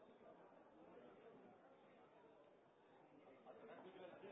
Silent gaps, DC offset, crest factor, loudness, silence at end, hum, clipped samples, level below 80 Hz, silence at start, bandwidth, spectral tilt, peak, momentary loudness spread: none; under 0.1%; 18 dB; -65 LUFS; 0 s; none; under 0.1%; under -90 dBFS; 0 s; 3.8 kHz; -2 dB/octave; -46 dBFS; 9 LU